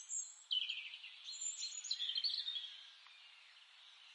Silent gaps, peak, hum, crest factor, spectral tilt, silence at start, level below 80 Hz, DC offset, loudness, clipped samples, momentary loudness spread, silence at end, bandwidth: none; -28 dBFS; none; 18 dB; 9.5 dB/octave; 0 s; under -90 dBFS; under 0.1%; -41 LUFS; under 0.1%; 22 LU; 0 s; 11.5 kHz